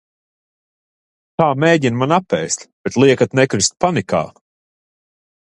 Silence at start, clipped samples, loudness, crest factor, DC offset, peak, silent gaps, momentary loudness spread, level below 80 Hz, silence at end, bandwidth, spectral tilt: 1.4 s; under 0.1%; -16 LUFS; 18 dB; under 0.1%; 0 dBFS; 2.73-2.84 s; 9 LU; -52 dBFS; 1.2 s; 11 kHz; -4.5 dB/octave